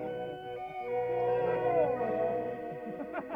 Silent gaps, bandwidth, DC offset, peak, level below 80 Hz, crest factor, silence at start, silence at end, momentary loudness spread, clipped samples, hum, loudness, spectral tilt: none; 5 kHz; under 0.1%; -18 dBFS; -66 dBFS; 14 dB; 0 s; 0 s; 11 LU; under 0.1%; none; -33 LUFS; -8 dB/octave